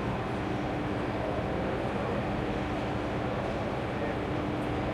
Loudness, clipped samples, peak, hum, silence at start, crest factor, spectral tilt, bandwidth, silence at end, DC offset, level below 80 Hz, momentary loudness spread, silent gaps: -32 LUFS; under 0.1%; -18 dBFS; none; 0 s; 12 dB; -7 dB/octave; 12.5 kHz; 0 s; under 0.1%; -44 dBFS; 1 LU; none